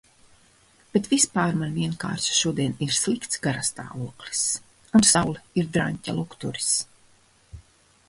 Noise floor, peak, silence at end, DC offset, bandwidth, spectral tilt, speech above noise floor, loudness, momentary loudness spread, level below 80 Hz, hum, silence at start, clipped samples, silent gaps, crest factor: -58 dBFS; -4 dBFS; 0.5 s; under 0.1%; 11.5 kHz; -3.5 dB/octave; 34 dB; -24 LUFS; 12 LU; -54 dBFS; none; 0.95 s; under 0.1%; none; 22 dB